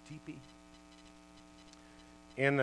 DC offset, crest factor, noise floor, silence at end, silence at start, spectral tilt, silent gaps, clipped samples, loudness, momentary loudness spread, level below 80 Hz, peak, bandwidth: under 0.1%; 24 dB; -58 dBFS; 0 s; 0.05 s; -6.5 dB/octave; none; under 0.1%; -38 LUFS; 22 LU; -68 dBFS; -14 dBFS; 11 kHz